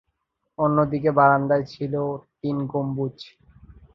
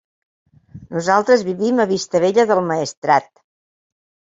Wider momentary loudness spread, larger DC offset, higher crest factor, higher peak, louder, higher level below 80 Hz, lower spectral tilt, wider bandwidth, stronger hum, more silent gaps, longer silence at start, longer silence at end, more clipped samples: first, 14 LU vs 7 LU; neither; about the same, 20 dB vs 18 dB; about the same, -4 dBFS vs -2 dBFS; second, -23 LUFS vs -17 LUFS; first, -56 dBFS vs -62 dBFS; first, -9.5 dB/octave vs -5 dB/octave; second, 6.2 kHz vs 8 kHz; neither; second, none vs 2.97-3.02 s; second, 0.6 s vs 0.75 s; second, 0.65 s vs 1.1 s; neither